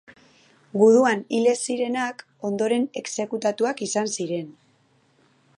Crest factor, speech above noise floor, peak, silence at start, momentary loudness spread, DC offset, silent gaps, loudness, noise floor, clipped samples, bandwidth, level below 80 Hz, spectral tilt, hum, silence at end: 18 dB; 40 dB; -6 dBFS; 0.75 s; 13 LU; under 0.1%; none; -23 LUFS; -62 dBFS; under 0.1%; 11.5 kHz; -78 dBFS; -4 dB/octave; none; 1.05 s